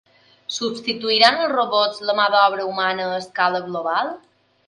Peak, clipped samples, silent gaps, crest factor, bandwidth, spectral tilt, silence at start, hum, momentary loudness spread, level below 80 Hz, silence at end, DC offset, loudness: 0 dBFS; under 0.1%; none; 20 dB; 11.5 kHz; -2.5 dB/octave; 0.5 s; none; 11 LU; -70 dBFS; 0.5 s; under 0.1%; -19 LUFS